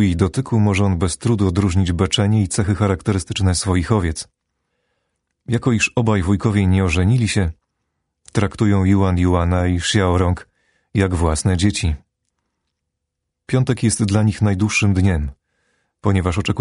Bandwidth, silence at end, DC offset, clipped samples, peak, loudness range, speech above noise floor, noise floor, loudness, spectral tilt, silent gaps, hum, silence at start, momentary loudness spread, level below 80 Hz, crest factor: 11 kHz; 0 s; under 0.1%; under 0.1%; -2 dBFS; 3 LU; 61 dB; -78 dBFS; -18 LUFS; -5.5 dB/octave; none; none; 0 s; 6 LU; -34 dBFS; 16 dB